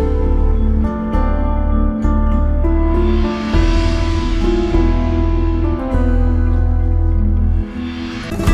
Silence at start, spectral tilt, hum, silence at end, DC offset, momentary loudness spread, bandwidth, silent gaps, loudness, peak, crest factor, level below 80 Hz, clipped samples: 0 s; -8 dB/octave; none; 0 s; under 0.1%; 3 LU; 8 kHz; none; -17 LUFS; -2 dBFS; 12 dB; -16 dBFS; under 0.1%